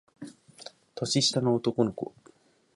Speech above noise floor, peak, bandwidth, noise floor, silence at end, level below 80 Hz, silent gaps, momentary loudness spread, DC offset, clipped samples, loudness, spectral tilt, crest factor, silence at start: 23 dB; -10 dBFS; 11.5 kHz; -50 dBFS; 0.65 s; -68 dBFS; none; 23 LU; under 0.1%; under 0.1%; -27 LUFS; -4.5 dB/octave; 20 dB; 0.2 s